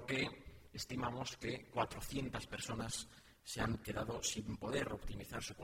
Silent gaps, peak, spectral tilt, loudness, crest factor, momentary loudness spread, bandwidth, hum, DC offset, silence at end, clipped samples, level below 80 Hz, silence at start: none; -24 dBFS; -4 dB/octave; -43 LUFS; 20 dB; 8 LU; 16 kHz; none; under 0.1%; 0 s; under 0.1%; -56 dBFS; 0 s